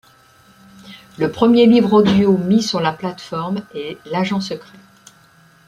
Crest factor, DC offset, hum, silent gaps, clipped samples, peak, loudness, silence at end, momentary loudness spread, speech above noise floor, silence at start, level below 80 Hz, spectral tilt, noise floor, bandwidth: 16 dB; under 0.1%; none; none; under 0.1%; -2 dBFS; -16 LUFS; 1.05 s; 16 LU; 34 dB; 0.85 s; -54 dBFS; -6.5 dB/octave; -50 dBFS; 11.5 kHz